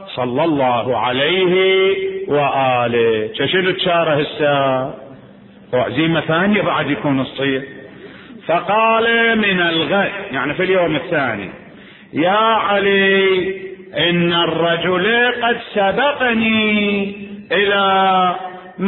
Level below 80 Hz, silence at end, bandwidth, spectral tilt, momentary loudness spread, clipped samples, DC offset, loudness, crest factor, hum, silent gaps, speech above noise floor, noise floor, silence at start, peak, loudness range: -52 dBFS; 0 s; 4.2 kHz; -10.5 dB/octave; 8 LU; under 0.1%; under 0.1%; -16 LUFS; 14 dB; none; none; 26 dB; -42 dBFS; 0 s; -4 dBFS; 3 LU